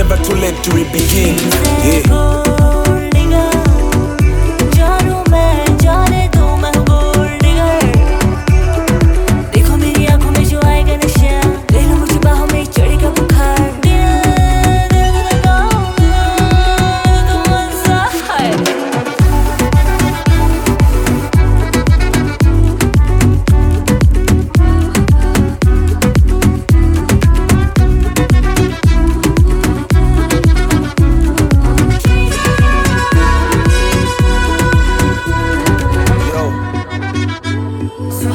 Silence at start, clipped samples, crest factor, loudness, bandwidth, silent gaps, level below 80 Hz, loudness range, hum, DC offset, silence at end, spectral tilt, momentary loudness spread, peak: 0 s; under 0.1%; 10 dB; -12 LUFS; 18.5 kHz; none; -14 dBFS; 1 LU; none; under 0.1%; 0 s; -5.5 dB/octave; 3 LU; 0 dBFS